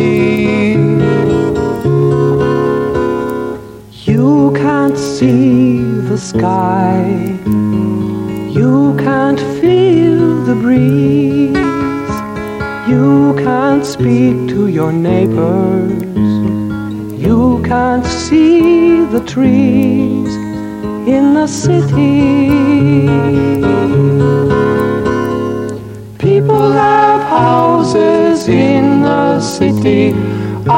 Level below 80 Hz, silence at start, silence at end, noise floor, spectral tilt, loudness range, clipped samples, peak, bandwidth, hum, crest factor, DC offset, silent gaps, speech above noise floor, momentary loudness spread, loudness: -36 dBFS; 0 s; 0 s; -31 dBFS; -7.5 dB/octave; 3 LU; under 0.1%; 0 dBFS; 16 kHz; none; 10 dB; under 0.1%; none; 21 dB; 8 LU; -11 LUFS